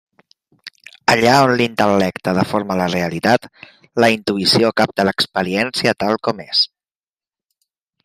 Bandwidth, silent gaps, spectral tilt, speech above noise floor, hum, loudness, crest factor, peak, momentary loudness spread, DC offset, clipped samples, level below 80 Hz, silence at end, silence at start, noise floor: 16 kHz; none; -4.5 dB/octave; over 74 dB; none; -16 LUFS; 18 dB; 0 dBFS; 7 LU; under 0.1%; under 0.1%; -56 dBFS; 1.4 s; 0.65 s; under -90 dBFS